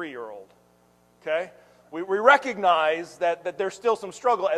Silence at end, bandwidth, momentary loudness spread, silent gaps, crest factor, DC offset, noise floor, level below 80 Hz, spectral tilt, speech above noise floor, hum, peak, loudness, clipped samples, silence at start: 0 s; 12.5 kHz; 20 LU; none; 22 dB; under 0.1%; -61 dBFS; -74 dBFS; -3.5 dB/octave; 37 dB; 60 Hz at -65 dBFS; -4 dBFS; -23 LUFS; under 0.1%; 0 s